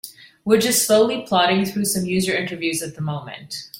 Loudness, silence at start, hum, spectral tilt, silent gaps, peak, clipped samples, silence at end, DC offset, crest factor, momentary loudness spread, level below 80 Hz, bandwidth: -19 LUFS; 0.05 s; none; -3.5 dB/octave; none; -2 dBFS; under 0.1%; 0 s; under 0.1%; 18 dB; 15 LU; -58 dBFS; 16.5 kHz